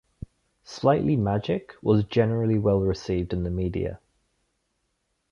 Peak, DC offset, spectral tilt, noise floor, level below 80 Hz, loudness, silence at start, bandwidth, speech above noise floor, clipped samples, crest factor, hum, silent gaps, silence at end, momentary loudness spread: -6 dBFS; under 0.1%; -8 dB/octave; -75 dBFS; -44 dBFS; -25 LUFS; 0.7 s; 7.2 kHz; 51 dB; under 0.1%; 18 dB; none; none; 1.35 s; 14 LU